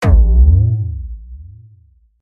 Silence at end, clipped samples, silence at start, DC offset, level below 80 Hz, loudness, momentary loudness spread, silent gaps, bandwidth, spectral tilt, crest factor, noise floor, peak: 0.8 s; under 0.1%; 0 s; under 0.1%; -14 dBFS; -13 LUFS; 20 LU; none; 5 kHz; -8.5 dB/octave; 12 dB; -49 dBFS; -2 dBFS